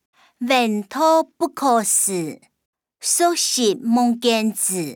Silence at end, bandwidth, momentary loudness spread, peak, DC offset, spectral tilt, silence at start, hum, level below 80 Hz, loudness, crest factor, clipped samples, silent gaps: 0 s; over 20 kHz; 9 LU; -6 dBFS; under 0.1%; -2.5 dB/octave; 0.4 s; none; -76 dBFS; -18 LUFS; 14 dB; under 0.1%; 2.65-2.73 s